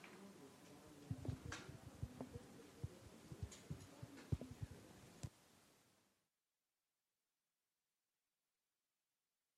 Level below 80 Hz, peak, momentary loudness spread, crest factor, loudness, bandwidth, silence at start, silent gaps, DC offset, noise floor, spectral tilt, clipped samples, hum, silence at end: -66 dBFS; -28 dBFS; 13 LU; 28 dB; -55 LUFS; 15.5 kHz; 0 s; none; under 0.1%; under -90 dBFS; -5.5 dB/octave; under 0.1%; none; 3.55 s